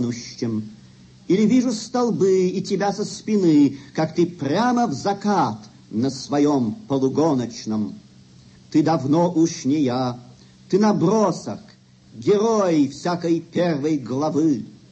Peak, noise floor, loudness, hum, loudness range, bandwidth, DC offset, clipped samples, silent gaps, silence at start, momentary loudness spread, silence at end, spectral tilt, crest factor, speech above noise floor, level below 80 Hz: -6 dBFS; -49 dBFS; -21 LUFS; none; 2 LU; 8.6 kHz; under 0.1%; under 0.1%; none; 0 s; 9 LU; 0.15 s; -6.5 dB/octave; 14 dB; 29 dB; -62 dBFS